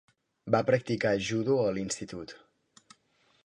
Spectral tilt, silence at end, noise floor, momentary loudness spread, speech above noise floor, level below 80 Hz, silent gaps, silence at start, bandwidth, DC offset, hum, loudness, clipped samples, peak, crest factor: -5 dB/octave; 1.05 s; -69 dBFS; 17 LU; 40 dB; -64 dBFS; none; 0.45 s; 11 kHz; under 0.1%; none; -29 LUFS; under 0.1%; -12 dBFS; 20 dB